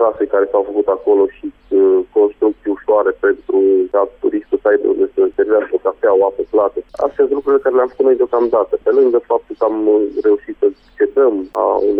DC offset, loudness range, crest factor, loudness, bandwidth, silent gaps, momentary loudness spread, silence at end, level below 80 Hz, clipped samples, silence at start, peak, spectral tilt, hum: under 0.1%; 1 LU; 10 dB; -15 LUFS; 3.5 kHz; none; 5 LU; 0 s; -52 dBFS; under 0.1%; 0 s; -4 dBFS; -8 dB/octave; none